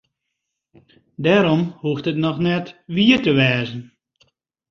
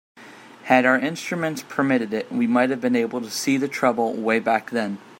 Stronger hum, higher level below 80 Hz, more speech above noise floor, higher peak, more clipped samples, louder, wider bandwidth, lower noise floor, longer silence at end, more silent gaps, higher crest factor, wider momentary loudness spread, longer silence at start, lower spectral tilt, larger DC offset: neither; first, -56 dBFS vs -70 dBFS; first, 60 dB vs 23 dB; about the same, -2 dBFS vs -2 dBFS; neither; first, -18 LUFS vs -22 LUFS; second, 7 kHz vs 16.5 kHz; first, -79 dBFS vs -44 dBFS; first, 0.85 s vs 0.05 s; neither; about the same, 18 dB vs 20 dB; about the same, 10 LU vs 8 LU; first, 1.2 s vs 0.15 s; first, -7 dB/octave vs -4.5 dB/octave; neither